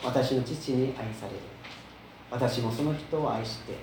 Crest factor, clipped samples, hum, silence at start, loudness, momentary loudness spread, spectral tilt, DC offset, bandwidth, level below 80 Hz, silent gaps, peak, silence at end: 18 dB; under 0.1%; none; 0 s; -31 LUFS; 16 LU; -6.5 dB/octave; under 0.1%; over 20 kHz; -58 dBFS; none; -14 dBFS; 0 s